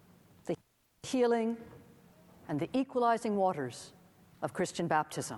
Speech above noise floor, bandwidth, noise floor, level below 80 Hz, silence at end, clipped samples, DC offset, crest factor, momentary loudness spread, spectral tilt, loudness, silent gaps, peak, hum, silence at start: 27 dB; 15 kHz; -59 dBFS; -72 dBFS; 0 s; under 0.1%; under 0.1%; 20 dB; 18 LU; -5.5 dB/octave; -33 LUFS; none; -16 dBFS; none; 0.45 s